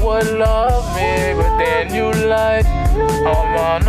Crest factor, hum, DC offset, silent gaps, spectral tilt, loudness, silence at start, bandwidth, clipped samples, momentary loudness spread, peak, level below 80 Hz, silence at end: 8 dB; none; under 0.1%; none; -6 dB/octave; -16 LUFS; 0 s; 15.5 kHz; under 0.1%; 2 LU; -6 dBFS; -20 dBFS; 0 s